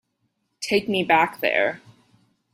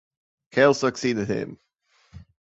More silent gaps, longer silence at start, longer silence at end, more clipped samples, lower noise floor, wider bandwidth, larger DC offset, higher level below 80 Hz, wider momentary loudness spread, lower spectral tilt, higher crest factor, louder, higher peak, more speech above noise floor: neither; about the same, 0.6 s vs 0.55 s; first, 0.75 s vs 0.35 s; neither; first, -73 dBFS vs -63 dBFS; first, 15.5 kHz vs 8.2 kHz; neither; second, -66 dBFS vs -58 dBFS; about the same, 12 LU vs 11 LU; about the same, -4 dB/octave vs -5 dB/octave; about the same, 20 dB vs 20 dB; about the same, -21 LUFS vs -23 LUFS; about the same, -4 dBFS vs -4 dBFS; first, 52 dB vs 42 dB